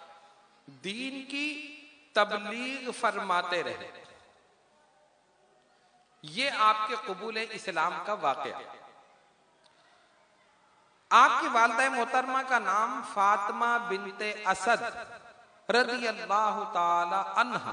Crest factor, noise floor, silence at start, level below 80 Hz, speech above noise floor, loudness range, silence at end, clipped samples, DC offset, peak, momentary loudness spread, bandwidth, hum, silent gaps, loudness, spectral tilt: 22 dB; -66 dBFS; 0 s; -80 dBFS; 37 dB; 9 LU; 0 s; under 0.1%; under 0.1%; -8 dBFS; 15 LU; 10.5 kHz; none; none; -28 LUFS; -2.5 dB/octave